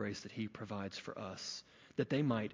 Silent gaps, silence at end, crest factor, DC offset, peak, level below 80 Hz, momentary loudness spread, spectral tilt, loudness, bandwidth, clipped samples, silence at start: none; 0 s; 20 dB; under 0.1%; -20 dBFS; -70 dBFS; 10 LU; -5.5 dB/octave; -41 LUFS; 7.6 kHz; under 0.1%; 0 s